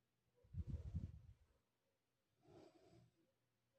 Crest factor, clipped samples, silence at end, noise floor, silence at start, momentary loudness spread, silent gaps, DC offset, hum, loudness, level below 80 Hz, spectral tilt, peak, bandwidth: 22 dB; under 0.1%; 0.7 s; -90 dBFS; 0.5 s; 17 LU; none; under 0.1%; none; -53 LUFS; -64 dBFS; -9 dB/octave; -36 dBFS; 8.4 kHz